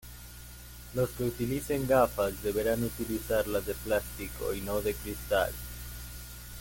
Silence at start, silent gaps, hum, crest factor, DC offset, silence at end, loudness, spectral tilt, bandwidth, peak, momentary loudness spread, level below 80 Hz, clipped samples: 0 s; none; 60 Hz at -45 dBFS; 20 dB; under 0.1%; 0 s; -31 LUFS; -5 dB/octave; 17 kHz; -12 dBFS; 16 LU; -46 dBFS; under 0.1%